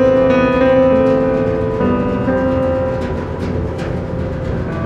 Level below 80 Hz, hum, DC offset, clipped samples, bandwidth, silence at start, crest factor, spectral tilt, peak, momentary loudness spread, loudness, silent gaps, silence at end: -32 dBFS; none; under 0.1%; under 0.1%; 7.8 kHz; 0 s; 12 dB; -8.5 dB/octave; -2 dBFS; 10 LU; -16 LUFS; none; 0 s